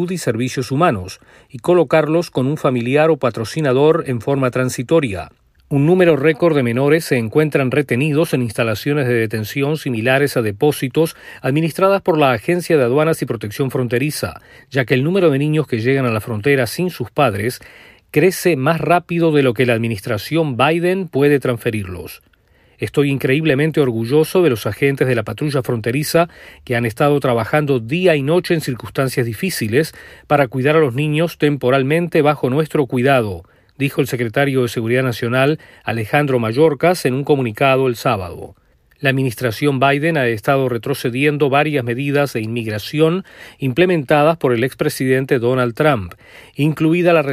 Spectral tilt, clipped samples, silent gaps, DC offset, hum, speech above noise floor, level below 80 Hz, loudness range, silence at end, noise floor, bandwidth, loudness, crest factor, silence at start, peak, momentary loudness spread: -6.5 dB/octave; under 0.1%; none; under 0.1%; none; 37 dB; -52 dBFS; 2 LU; 0 s; -54 dBFS; 15.5 kHz; -17 LUFS; 16 dB; 0 s; -2 dBFS; 7 LU